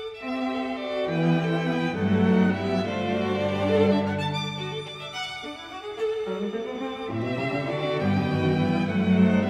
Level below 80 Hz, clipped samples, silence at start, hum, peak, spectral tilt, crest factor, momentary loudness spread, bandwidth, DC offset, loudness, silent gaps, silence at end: -60 dBFS; under 0.1%; 0 s; none; -8 dBFS; -7 dB/octave; 16 dB; 11 LU; 9.4 kHz; under 0.1%; -26 LUFS; none; 0 s